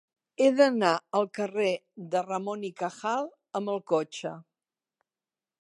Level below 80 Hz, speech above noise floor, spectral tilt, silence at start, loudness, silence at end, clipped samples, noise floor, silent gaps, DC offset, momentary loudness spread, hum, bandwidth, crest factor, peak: -86 dBFS; over 62 dB; -5 dB/octave; 0.4 s; -28 LUFS; 1.2 s; under 0.1%; under -90 dBFS; none; under 0.1%; 14 LU; none; 11.5 kHz; 22 dB; -8 dBFS